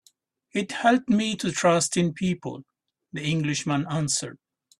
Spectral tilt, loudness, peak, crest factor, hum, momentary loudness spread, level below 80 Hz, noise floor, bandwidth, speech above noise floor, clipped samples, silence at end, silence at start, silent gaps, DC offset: -4.5 dB/octave; -25 LUFS; -6 dBFS; 20 dB; none; 12 LU; -62 dBFS; -64 dBFS; 13 kHz; 39 dB; under 0.1%; 0.45 s; 0.55 s; none; under 0.1%